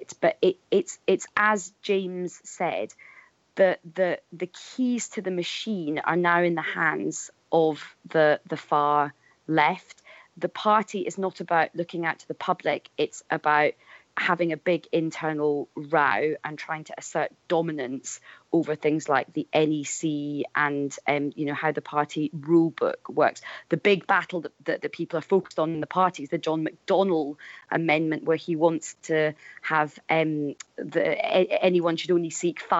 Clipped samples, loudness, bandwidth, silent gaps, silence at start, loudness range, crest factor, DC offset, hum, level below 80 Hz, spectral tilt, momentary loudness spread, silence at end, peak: under 0.1%; -26 LUFS; 8.2 kHz; none; 0 s; 3 LU; 18 dB; under 0.1%; none; -76 dBFS; -5 dB/octave; 10 LU; 0 s; -8 dBFS